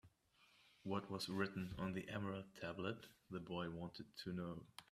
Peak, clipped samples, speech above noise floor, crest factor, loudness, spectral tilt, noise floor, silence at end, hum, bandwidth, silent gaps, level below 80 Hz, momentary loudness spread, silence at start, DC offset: -26 dBFS; under 0.1%; 27 dB; 22 dB; -48 LUFS; -6 dB/octave; -75 dBFS; 0.1 s; none; 15 kHz; none; -74 dBFS; 9 LU; 0.05 s; under 0.1%